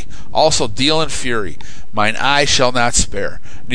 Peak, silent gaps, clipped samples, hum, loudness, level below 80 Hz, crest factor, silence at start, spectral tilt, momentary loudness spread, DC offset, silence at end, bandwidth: 0 dBFS; none; under 0.1%; none; -15 LUFS; -32 dBFS; 18 dB; 0 s; -2.5 dB/octave; 12 LU; 20%; 0 s; 11 kHz